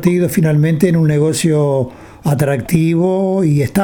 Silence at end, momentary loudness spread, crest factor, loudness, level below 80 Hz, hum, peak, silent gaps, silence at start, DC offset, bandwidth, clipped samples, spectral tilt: 0 s; 5 LU; 12 dB; -14 LUFS; -44 dBFS; none; 0 dBFS; none; 0 s; under 0.1%; 18 kHz; under 0.1%; -7 dB/octave